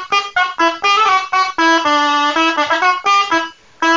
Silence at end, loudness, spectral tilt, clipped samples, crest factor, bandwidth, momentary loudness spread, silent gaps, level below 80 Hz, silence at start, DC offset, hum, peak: 0 s; -13 LUFS; -1 dB/octave; under 0.1%; 12 dB; 7.6 kHz; 5 LU; none; -56 dBFS; 0 s; under 0.1%; none; -2 dBFS